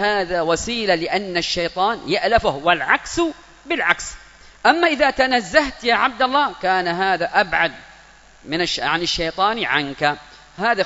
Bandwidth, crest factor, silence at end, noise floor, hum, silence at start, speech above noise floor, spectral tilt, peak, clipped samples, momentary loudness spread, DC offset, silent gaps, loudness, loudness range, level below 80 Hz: 8 kHz; 20 dB; 0 s; -47 dBFS; none; 0 s; 28 dB; -3 dB/octave; 0 dBFS; under 0.1%; 6 LU; under 0.1%; none; -19 LUFS; 3 LU; -44 dBFS